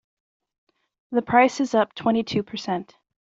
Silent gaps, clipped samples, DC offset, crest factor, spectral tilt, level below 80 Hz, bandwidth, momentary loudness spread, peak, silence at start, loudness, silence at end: none; under 0.1%; under 0.1%; 22 dB; -5 dB/octave; -64 dBFS; 7.8 kHz; 10 LU; -4 dBFS; 1.1 s; -23 LUFS; 0.55 s